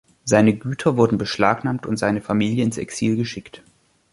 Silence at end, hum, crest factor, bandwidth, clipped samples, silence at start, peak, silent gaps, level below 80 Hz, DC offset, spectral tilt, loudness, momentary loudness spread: 0.55 s; none; 18 dB; 11.5 kHz; under 0.1%; 0.25 s; -2 dBFS; none; -52 dBFS; under 0.1%; -6 dB/octave; -20 LUFS; 8 LU